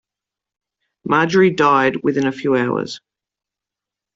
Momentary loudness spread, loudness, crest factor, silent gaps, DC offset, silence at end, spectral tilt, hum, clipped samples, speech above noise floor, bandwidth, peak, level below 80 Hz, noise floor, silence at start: 15 LU; -16 LUFS; 18 dB; none; under 0.1%; 1.2 s; -6 dB/octave; none; under 0.1%; 70 dB; 7.6 kHz; -2 dBFS; -60 dBFS; -87 dBFS; 1.05 s